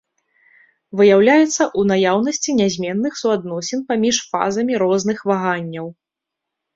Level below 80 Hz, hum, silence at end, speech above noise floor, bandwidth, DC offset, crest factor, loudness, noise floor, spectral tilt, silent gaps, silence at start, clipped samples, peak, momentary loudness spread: -60 dBFS; none; 0.85 s; 66 dB; 7.8 kHz; under 0.1%; 16 dB; -17 LUFS; -83 dBFS; -4.5 dB/octave; none; 0.95 s; under 0.1%; -2 dBFS; 11 LU